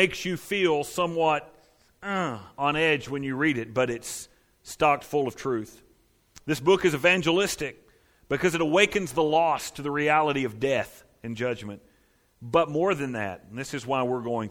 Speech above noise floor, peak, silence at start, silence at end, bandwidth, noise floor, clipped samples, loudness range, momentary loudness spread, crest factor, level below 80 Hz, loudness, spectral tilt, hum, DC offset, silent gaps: 39 dB; -4 dBFS; 0 s; 0 s; 17.5 kHz; -64 dBFS; under 0.1%; 5 LU; 15 LU; 22 dB; -58 dBFS; -26 LUFS; -4.5 dB/octave; none; under 0.1%; none